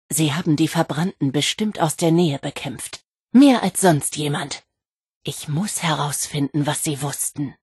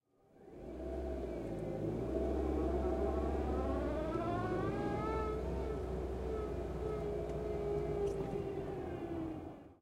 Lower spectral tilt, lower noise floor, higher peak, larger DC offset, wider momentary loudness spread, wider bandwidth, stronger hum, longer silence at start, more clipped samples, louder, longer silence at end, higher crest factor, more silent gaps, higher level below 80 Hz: second, -4.5 dB/octave vs -8.5 dB/octave; first, -85 dBFS vs -62 dBFS; first, -4 dBFS vs -24 dBFS; neither; first, 14 LU vs 6 LU; about the same, 12.5 kHz vs 12 kHz; neither; second, 0.1 s vs 0.35 s; neither; first, -20 LUFS vs -39 LUFS; about the same, 0.1 s vs 0.1 s; about the same, 18 dB vs 14 dB; first, 3.05-3.09 s, 3.23-3.27 s, 4.92-5.04 s, 5.11-5.21 s vs none; second, -60 dBFS vs -46 dBFS